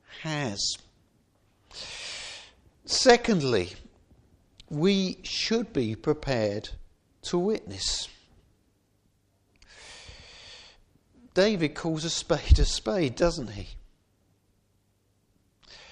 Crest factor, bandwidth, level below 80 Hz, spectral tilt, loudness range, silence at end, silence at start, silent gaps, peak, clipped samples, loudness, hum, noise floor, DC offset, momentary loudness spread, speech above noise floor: 24 dB; 11 kHz; -38 dBFS; -4.5 dB/octave; 8 LU; 0.1 s; 0.1 s; none; -6 dBFS; under 0.1%; -27 LUFS; none; -69 dBFS; under 0.1%; 23 LU; 44 dB